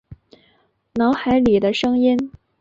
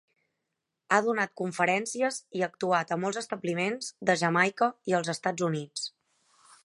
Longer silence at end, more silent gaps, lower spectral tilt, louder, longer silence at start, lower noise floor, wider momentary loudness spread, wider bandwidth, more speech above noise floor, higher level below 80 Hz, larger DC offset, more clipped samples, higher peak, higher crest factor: second, 0.3 s vs 0.75 s; neither; first, -6.5 dB/octave vs -4.5 dB/octave; first, -18 LUFS vs -29 LUFS; second, 0.1 s vs 0.9 s; second, -61 dBFS vs -84 dBFS; about the same, 10 LU vs 8 LU; second, 7.6 kHz vs 11.5 kHz; second, 44 dB vs 56 dB; first, -48 dBFS vs -80 dBFS; neither; neither; about the same, -6 dBFS vs -8 dBFS; second, 14 dB vs 22 dB